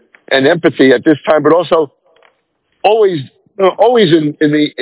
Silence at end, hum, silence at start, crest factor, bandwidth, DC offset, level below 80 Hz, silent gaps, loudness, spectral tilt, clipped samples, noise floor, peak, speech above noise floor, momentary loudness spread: 0 s; none; 0.3 s; 12 dB; 4 kHz; under 0.1%; -58 dBFS; none; -11 LUFS; -10 dB/octave; 0.6%; -62 dBFS; 0 dBFS; 52 dB; 6 LU